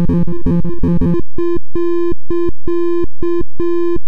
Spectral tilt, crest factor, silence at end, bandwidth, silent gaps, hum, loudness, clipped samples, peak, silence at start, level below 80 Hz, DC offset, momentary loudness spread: -10.5 dB/octave; 12 dB; 0 s; 5.4 kHz; none; none; -18 LUFS; under 0.1%; -4 dBFS; 0 s; -26 dBFS; 40%; 4 LU